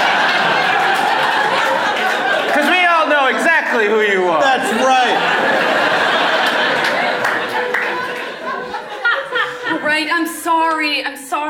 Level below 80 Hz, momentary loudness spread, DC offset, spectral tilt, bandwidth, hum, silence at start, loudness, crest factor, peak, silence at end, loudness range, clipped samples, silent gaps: -66 dBFS; 7 LU; under 0.1%; -2.5 dB/octave; 17.5 kHz; none; 0 s; -15 LUFS; 14 dB; -2 dBFS; 0 s; 5 LU; under 0.1%; none